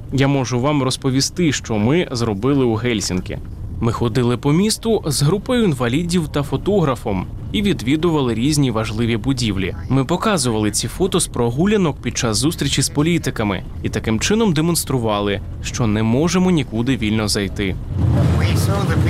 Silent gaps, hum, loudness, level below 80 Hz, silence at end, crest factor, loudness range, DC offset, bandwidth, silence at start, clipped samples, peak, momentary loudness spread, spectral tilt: none; none; -18 LUFS; -34 dBFS; 0 s; 14 dB; 1 LU; under 0.1%; 16 kHz; 0 s; under 0.1%; -4 dBFS; 6 LU; -5 dB/octave